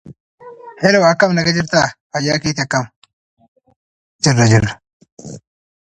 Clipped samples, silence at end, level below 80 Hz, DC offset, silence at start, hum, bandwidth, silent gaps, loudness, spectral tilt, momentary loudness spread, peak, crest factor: under 0.1%; 0.45 s; -44 dBFS; under 0.1%; 0.05 s; none; 11 kHz; 0.20-0.38 s, 2.00-2.10 s, 2.96-3.02 s, 3.13-3.37 s, 3.48-3.56 s, 3.76-4.19 s, 4.93-5.00 s, 5.12-5.17 s; -15 LUFS; -5 dB/octave; 23 LU; 0 dBFS; 18 dB